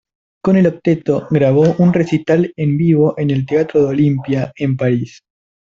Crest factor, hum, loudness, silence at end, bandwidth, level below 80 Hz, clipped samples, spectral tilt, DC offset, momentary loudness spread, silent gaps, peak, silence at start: 12 dB; none; -15 LUFS; 0.5 s; 7.4 kHz; -50 dBFS; under 0.1%; -9 dB/octave; under 0.1%; 6 LU; none; -2 dBFS; 0.45 s